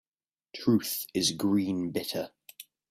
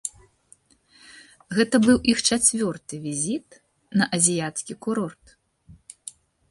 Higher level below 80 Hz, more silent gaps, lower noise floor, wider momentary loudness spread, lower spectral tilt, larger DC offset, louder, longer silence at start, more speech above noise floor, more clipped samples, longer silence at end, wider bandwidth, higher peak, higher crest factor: second, -70 dBFS vs -56 dBFS; neither; first, under -90 dBFS vs -58 dBFS; first, 21 LU vs 17 LU; about the same, -4.5 dB/octave vs -3.5 dB/octave; neither; second, -29 LUFS vs -22 LUFS; first, 0.55 s vs 0.05 s; first, over 61 dB vs 35 dB; neither; about the same, 0.3 s vs 0.4 s; first, 16 kHz vs 11.5 kHz; second, -12 dBFS vs -4 dBFS; about the same, 18 dB vs 22 dB